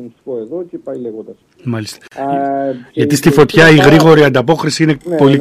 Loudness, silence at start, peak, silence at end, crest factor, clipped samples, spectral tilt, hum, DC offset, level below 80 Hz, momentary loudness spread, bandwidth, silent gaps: -10 LUFS; 0 s; 0 dBFS; 0 s; 12 dB; 0.1%; -6 dB/octave; none; under 0.1%; -44 dBFS; 19 LU; 15.5 kHz; none